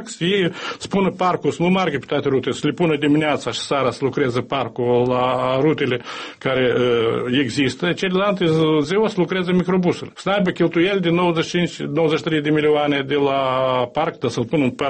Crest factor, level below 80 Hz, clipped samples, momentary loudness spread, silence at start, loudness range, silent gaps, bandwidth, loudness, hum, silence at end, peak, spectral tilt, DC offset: 12 dB; -54 dBFS; under 0.1%; 5 LU; 0 s; 1 LU; none; 8.8 kHz; -19 LUFS; none; 0 s; -6 dBFS; -6 dB/octave; under 0.1%